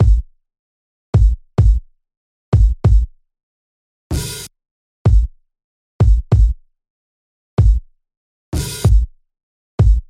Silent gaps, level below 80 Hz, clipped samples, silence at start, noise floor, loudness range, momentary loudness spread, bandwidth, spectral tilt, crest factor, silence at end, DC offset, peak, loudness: 0.59-1.13 s, 2.17-2.52 s, 3.43-4.10 s, 4.71-5.05 s, 5.64-5.99 s, 6.90-7.57 s, 8.17-8.52 s, 9.43-9.78 s; -18 dBFS; under 0.1%; 0 s; under -90 dBFS; 3 LU; 12 LU; 14.5 kHz; -7 dB/octave; 12 dB; 0.1 s; under 0.1%; -4 dBFS; -17 LUFS